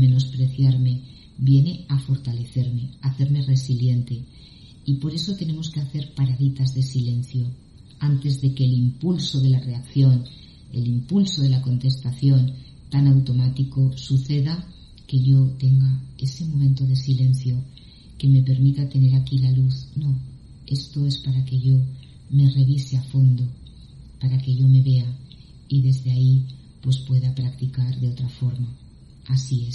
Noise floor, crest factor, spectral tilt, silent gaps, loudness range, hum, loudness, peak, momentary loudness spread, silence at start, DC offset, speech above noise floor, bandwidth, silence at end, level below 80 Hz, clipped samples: -43 dBFS; 14 dB; -8 dB/octave; none; 4 LU; none; -21 LUFS; -6 dBFS; 10 LU; 0 s; under 0.1%; 23 dB; 7.2 kHz; 0 s; -48 dBFS; under 0.1%